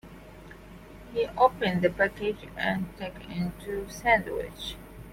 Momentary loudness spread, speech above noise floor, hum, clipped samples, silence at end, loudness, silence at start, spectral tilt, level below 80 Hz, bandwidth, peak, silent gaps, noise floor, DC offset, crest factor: 24 LU; 19 dB; none; under 0.1%; 0 s; -28 LUFS; 0.05 s; -5.5 dB/octave; -50 dBFS; 16.5 kHz; -8 dBFS; none; -47 dBFS; under 0.1%; 22 dB